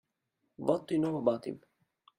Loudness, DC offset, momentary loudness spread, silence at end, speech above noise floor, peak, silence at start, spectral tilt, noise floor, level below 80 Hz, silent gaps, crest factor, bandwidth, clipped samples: -32 LUFS; under 0.1%; 12 LU; 0.6 s; 50 dB; -14 dBFS; 0.6 s; -8 dB/octave; -82 dBFS; -74 dBFS; none; 20 dB; 12 kHz; under 0.1%